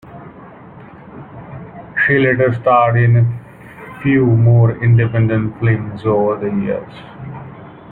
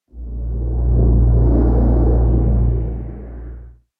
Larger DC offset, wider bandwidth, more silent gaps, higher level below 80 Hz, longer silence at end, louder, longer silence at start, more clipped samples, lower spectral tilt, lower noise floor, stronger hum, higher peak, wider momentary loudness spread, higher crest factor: neither; first, 4 kHz vs 1.8 kHz; neither; second, -46 dBFS vs -18 dBFS; second, 0 s vs 0.3 s; first, -14 LUFS vs -17 LUFS; about the same, 0.05 s vs 0.15 s; neither; second, -10.5 dB/octave vs -14 dB/octave; about the same, -37 dBFS vs -36 dBFS; neither; about the same, -2 dBFS vs -4 dBFS; first, 23 LU vs 18 LU; about the same, 14 dB vs 12 dB